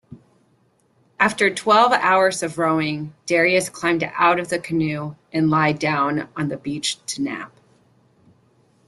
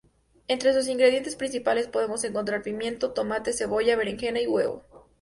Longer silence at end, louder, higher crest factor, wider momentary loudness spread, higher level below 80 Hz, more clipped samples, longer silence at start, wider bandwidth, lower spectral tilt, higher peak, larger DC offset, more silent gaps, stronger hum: first, 1.4 s vs 0.2 s; first, -20 LUFS vs -26 LUFS; about the same, 20 dB vs 18 dB; first, 11 LU vs 8 LU; about the same, -60 dBFS vs -58 dBFS; neither; second, 0.1 s vs 0.5 s; about the same, 12.5 kHz vs 11.5 kHz; first, -4.5 dB/octave vs -3 dB/octave; first, -2 dBFS vs -8 dBFS; neither; neither; neither